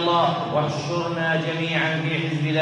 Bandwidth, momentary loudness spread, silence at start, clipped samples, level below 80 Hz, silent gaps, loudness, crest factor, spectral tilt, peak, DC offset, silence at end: 9.8 kHz; 4 LU; 0 s; under 0.1%; -64 dBFS; none; -23 LUFS; 14 dB; -6 dB/octave; -8 dBFS; under 0.1%; 0 s